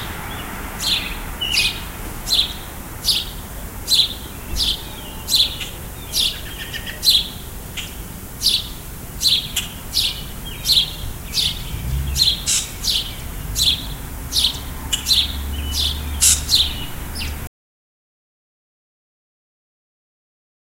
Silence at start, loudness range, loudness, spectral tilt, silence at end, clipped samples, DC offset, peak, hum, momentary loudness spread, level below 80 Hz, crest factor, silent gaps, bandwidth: 0 s; 3 LU; -19 LUFS; -1 dB/octave; 3.2 s; under 0.1%; under 0.1%; 0 dBFS; none; 15 LU; -32 dBFS; 22 dB; none; 16 kHz